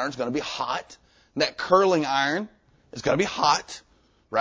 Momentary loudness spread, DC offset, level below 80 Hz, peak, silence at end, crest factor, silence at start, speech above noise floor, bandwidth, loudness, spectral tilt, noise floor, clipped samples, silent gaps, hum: 19 LU; under 0.1%; -58 dBFS; -6 dBFS; 0 s; 20 dB; 0 s; 25 dB; 8 kHz; -24 LUFS; -4 dB/octave; -50 dBFS; under 0.1%; none; none